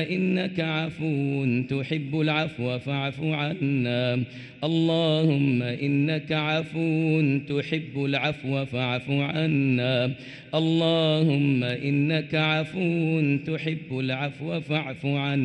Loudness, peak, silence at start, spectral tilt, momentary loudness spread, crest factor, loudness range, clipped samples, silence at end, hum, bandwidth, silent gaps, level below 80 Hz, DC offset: -25 LUFS; -10 dBFS; 0 s; -7.5 dB/octave; 7 LU; 14 dB; 3 LU; under 0.1%; 0 s; none; 8.8 kHz; none; -64 dBFS; under 0.1%